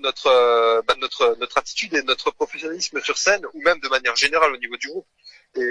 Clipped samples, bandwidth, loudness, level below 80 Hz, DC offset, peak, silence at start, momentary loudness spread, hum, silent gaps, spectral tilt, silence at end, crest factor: under 0.1%; 10.5 kHz; -20 LUFS; -58 dBFS; under 0.1%; -4 dBFS; 0 s; 11 LU; none; none; -0.5 dB/octave; 0 s; 16 dB